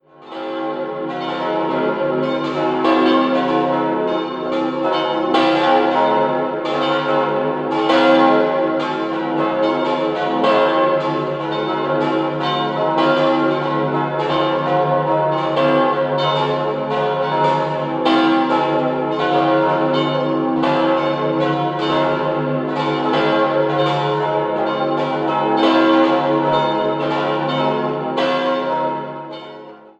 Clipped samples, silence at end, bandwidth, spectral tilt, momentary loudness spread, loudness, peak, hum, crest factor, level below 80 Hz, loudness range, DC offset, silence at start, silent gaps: under 0.1%; 0.1 s; 8.2 kHz; -7 dB/octave; 6 LU; -17 LUFS; 0 dBFS; none; 16 dB; -58 dBFS; 2 LU; under 0.1%; 0.2 s; none